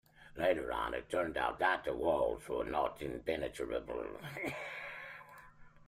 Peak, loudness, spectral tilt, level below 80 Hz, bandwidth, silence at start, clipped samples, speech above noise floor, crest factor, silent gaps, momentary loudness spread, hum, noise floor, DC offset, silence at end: -18 dBFS; -37 LUFS; -5 dB/octave; -58 dBFS; 15.5 kHz; 0.2 s; under 0.1%; 20 dB; 20 dB; none; 14 LU; none; -57 dBFS; under 0.1%; 0.05 s